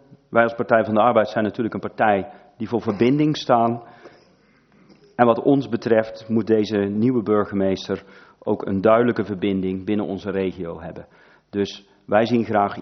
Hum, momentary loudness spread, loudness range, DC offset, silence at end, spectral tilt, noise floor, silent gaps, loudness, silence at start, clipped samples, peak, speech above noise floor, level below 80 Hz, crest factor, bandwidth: none; 13 LU; 3 LU; under 0.1%; 0 s; -7.5 dB/octave; -57 dBFS; none; -21 LUFS; 0.3 s; under 0.1%; 0 dBFS; 36 dB; -62 dBFS; 22 dB; 6.4 kHz